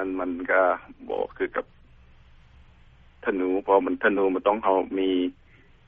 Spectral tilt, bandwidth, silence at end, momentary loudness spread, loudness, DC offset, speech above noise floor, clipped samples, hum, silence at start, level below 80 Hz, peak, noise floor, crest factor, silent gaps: -3 dB/octave; 3.8 kHz; 0.55 s; 10 LU; -25 LUFS; under 0.1%; 29 dB; under 0.1%; none; 0 s; -56 dBFS; -6 dBFS; -53 dBFS; 20 dB; none